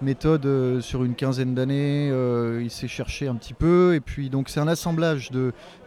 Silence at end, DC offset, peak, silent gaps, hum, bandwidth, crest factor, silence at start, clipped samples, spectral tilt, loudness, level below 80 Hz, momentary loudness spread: 0.1 s; under 0.1%; -8 dBFS; none; none; 15.5 kHz; 14 dB; 0 s; under 0.1%; -7 dB/octave; -24 LUFS; -42 dBFS; 9 LU